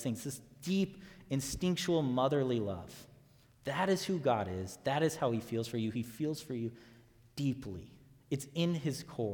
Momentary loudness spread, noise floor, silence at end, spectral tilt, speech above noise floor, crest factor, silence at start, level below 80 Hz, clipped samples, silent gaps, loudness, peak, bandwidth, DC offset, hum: 12 LU; -63 dBFS; 0 s; -5.5 dB/octave; 28 dB; 18 dB; 0 s; -62 dBFS; under 0.1%; none; -35 LUFS; -18 dBFS; 19 kHz; under 0.1%; none